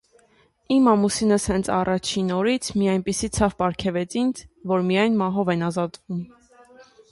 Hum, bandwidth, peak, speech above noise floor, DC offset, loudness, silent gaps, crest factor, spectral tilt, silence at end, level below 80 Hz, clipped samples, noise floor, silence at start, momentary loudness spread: none; 11.5 kHz; -6 dBFS; 38 dB; under 0.1%; -22 LUFS; none; 18 dB; -5 dB/octave; 0.3 s; -46 dBFS; under 0.1%; -60 dBFS; 0.7 s; 9 LU